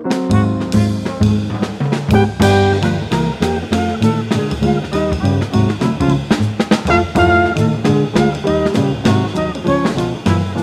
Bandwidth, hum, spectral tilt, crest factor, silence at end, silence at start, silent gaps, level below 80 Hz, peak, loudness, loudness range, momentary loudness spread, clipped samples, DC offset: 13.5 kHz; none; -7 dB/octave; 14 dB; 0 s; 0 s; none; -32 dBFS; 0 dBFS; -15 LUFS; 2 LU; 6 LU; under 0.1%; under 0.1%